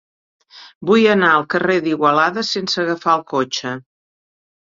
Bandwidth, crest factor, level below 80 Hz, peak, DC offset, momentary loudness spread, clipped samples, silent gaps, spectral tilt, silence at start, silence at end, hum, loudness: 7.6 kHz; 16 dB; -62 dBFS; -2 dBFS; under 0.1%; 11 LU; under 0.1%; 0.75-0.81 s; -4.5 dB/octave; 0.55 s; 0.9 s; none; -16 LUFS